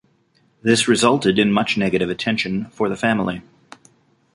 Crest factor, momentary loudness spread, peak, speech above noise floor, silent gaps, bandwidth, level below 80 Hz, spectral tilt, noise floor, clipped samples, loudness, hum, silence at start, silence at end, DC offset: 18 dB; 9 LU; -2 dBFS; 42 dB; none; 11.5 kHz; -52 dBFS; -4.5 dB/octave; -61 dBFS; under 0.1%; -19 LUFS; none; 0.65 s; 0.95 s; under 0.1%